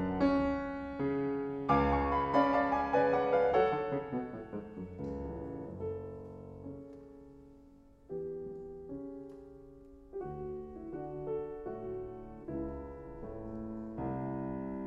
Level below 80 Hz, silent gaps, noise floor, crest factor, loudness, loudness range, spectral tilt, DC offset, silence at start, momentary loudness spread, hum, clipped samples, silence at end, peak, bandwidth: -52 dBFS; none; -59 dBFS; 22 dB; -35 LUFS; 16 LU; -8.5 dB/octave; under 0.1%; 0 s; 19 LU; none; under 0.1%; 0 s; -14 dBFS; 6.6 kHz